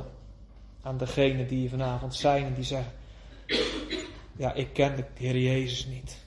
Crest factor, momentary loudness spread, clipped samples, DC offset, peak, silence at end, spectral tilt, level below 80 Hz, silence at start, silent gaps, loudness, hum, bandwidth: 20 dB; 16 LU; under 0.1%; under 0.1%; -10 dBFS; 0 s; -5.5 dB/octave; -46 dBFS; 0 s; none; -29 LUFS; none; 11.5 kHz